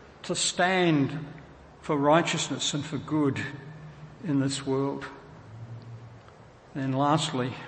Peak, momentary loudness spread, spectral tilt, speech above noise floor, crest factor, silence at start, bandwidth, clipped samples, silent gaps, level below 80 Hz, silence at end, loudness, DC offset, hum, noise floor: -8 dBFS; 22 LU; -4.5 dB/octave; 24 dB; 22 dB; 0 s; 8.8 kHz; under 0.1%; none; -62 dBFS; 0 s; -27 LUFS; under 0.1%; none; -51 dBFS